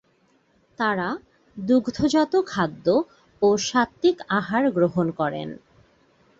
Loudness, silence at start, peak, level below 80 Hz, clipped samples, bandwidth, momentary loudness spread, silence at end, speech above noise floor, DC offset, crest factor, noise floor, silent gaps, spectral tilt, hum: -23 LUFS; 0.8 s; -6 dBFS; -58 dBFS; under 0.1%; 8 kHz; 13 LU; 0.85 s; 41 dB; under 0.1%; 18 dB; -63 dBFS; none; -5.5 dB/octave; none